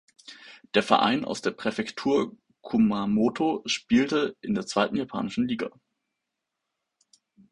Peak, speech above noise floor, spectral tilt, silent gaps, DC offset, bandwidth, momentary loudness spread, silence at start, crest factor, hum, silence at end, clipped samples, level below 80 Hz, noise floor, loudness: -4 dBFS; 58 dB; -5 dB/octave; none; under 0.1%; 11 kHz; 9 LU; 0.3 s; 24 dB; none; 1.8 s; under 0.1%; -62 dBFS; -84 dBFS; -26 LUFS